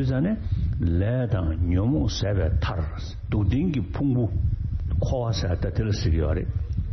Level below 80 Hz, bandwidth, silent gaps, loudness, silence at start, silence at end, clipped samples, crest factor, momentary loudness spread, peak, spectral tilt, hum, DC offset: -30 dBFS; 6.4 kHz; none; -25 LUFS; 0 s; 0 s; under 0.1%; 12 dB; 5 LU; -12 dBFS; -7.5 dB/octave; none; under 0.1%